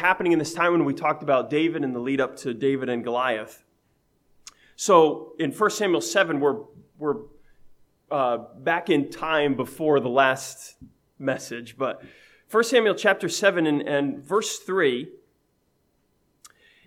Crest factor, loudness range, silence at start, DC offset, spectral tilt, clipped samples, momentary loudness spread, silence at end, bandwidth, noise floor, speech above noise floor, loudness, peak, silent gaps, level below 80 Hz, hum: 22 dB; 3 LU; 0 s; under 0.1%; -4 dB/octave; under 0.1%; 11 LU; 0.4 s; 16 kHz; -69 dBFS; 46 dB; -24 LUFS; -4 dBFS; none; -66 dBFS; none